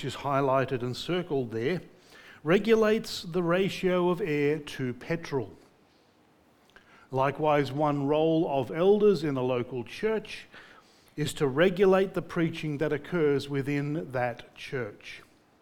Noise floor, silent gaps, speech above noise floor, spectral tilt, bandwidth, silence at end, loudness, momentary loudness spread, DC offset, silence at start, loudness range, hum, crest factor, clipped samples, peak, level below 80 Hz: -63 dBFS; none; 35 dB; -6.5 dB/octave; 18 kHz; 0.4 s; -28 LUFS; 12 LU; under 0.1%; 0 s; 5 LU; none; 18 dB; under 0.1%; -10 dBFS; -58 dBFS